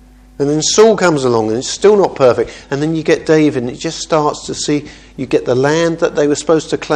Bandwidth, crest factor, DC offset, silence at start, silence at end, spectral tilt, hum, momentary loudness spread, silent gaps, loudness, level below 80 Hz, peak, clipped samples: 10 kHz; 14 dB; under 0.1%; 0.4 s; 0 s; -4.5 dB/octave; none; 10 LU; none; -13 LUFS; -44 dBFS; 0 dBFS; 0.1%